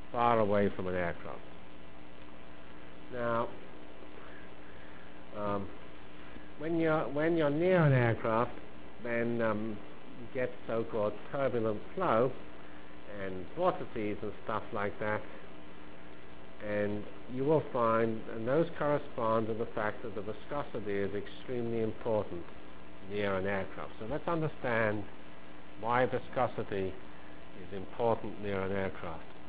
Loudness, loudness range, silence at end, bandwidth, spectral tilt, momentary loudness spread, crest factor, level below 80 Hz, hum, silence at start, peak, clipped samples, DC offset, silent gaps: -34 LUFS; 9 LU; 0 s; 4 kHz; -6 dB/octave; 22 LU; 22 dB; -58 dBFS; none; 0 s; -12 dBFS; under 0.1%; 1%; none